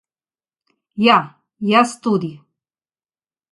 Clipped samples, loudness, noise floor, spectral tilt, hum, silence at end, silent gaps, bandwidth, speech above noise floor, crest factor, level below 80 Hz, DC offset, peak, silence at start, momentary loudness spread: under 0.1%; -17 LUFS; under -90 dBFS; -5 dB/octave; none; 1.15 s; none; 11.5 kHz; over 74 dB; 20 dB; -68 dBFS; under 0.1%; 0 dBFS; 0.95 s; 18 LU